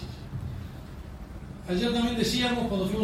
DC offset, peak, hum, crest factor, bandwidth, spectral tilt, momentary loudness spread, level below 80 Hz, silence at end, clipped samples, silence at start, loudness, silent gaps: under 0.1%; -12 dBFS; none; 16 dB; 16 kHz; -5 dB/octave; 17 LU; -44 dBFS; 0 s; under 0.1%; 0 s; -28 LUFS; none